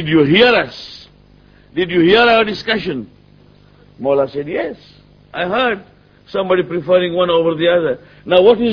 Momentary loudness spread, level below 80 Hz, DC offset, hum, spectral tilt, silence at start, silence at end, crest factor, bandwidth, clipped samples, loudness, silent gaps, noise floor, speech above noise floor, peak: 16 LU; -48 dBFS; under 0.1%; 50 Hz at -55 dBFS; -7 dB/octave; 0 s; 0 s; 16 dB; 5.4 kHz; under 0.1%; -15 LUFS; none; -46 dBFS; 32 dB; 0 dBFS